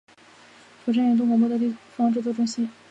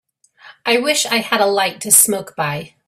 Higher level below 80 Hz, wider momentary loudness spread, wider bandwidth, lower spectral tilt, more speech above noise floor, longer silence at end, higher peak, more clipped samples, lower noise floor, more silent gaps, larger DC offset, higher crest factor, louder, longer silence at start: second, -76 dBFS vs -62 dBFS; second, 8 LU vs 12 LU; second, 8.2 kHz vs 16 kHz; first, -6 dB/octave vs -1.5 dB/octave; about the same, 29 dB vs 29 dB; about the same, 0.2 s vs 0.2 s; second, -12 dBFS vs 0 dBFS; neither; first, -51 dBFS vs -45 dBFS; neither; neither; second, 12 dB vs 18 dB; second, -23 LUFS vs -15 LUFS; first, 0.85 s vs 0.45 s